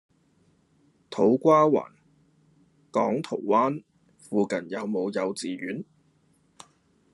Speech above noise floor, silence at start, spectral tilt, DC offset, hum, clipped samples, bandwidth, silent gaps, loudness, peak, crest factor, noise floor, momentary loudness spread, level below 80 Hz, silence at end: 41 dB; 1.1 s; -6.5 dB/octave; under 0.1%; none; under 0.1%; 11.5 kHz; none; -25 LUFS; -8 dBFS; 20 dB; -65 dBFS; 18 LU; -76 dBFS; 1.3 s